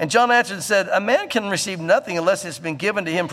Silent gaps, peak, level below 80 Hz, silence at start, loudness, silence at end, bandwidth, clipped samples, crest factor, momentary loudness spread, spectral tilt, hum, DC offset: none; -4 dBFS; -68 dBFS; 0 s; -20 LUFS; 0 s; 15 kHz; under 0.1%; 16 dB; 7 LU; -3.5 dB/octave; none; under 0.1%